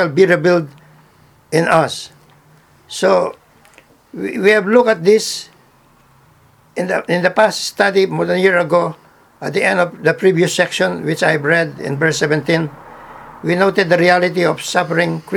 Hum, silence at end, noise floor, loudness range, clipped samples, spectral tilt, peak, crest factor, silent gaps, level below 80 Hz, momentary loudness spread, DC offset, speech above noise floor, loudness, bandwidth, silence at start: none; 0 s; -50 dBFS; 3 LU; under 0.1%; -5 dB/octave; 0 dBFS; 16 dB; none; -58 dBFS; 14 LU; under 0.1%; 36 dB; -15 LUFS; 17.5 kHz; 0 s